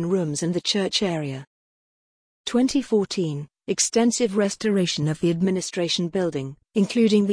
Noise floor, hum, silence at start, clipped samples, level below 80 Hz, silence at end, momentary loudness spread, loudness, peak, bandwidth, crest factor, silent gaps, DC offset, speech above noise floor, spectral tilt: under -90 dBFS; none; 0 s; under 0.1%; -60 dBFS; 0 s; 9 LU; -23 LUFS; -8 dBFS; 10.5 kHz; 14 dB; 1.47-2.44 s; under 0.1%; over 68 dB; -4.5 dB/octave